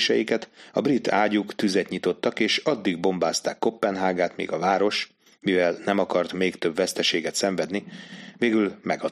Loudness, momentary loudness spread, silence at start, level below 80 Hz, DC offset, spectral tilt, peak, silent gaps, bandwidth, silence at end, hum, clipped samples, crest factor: -24 LUFS; 6 LU; 0 s; -70 dBFS; under 0.1%; -4 dB/octave; -6 dBFS; none; 13.5 kHz; 0 s; none; under 0.1%; 18 dB